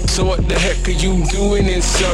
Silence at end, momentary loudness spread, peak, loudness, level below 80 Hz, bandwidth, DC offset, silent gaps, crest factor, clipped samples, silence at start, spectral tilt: 0 s; 2 LU; -2 dBFS; -17 LUFS; -18 dBFS; 12 kHz; under 0.1%; none; 12 dB; under 0.1%; 0 s; -4 dB/octave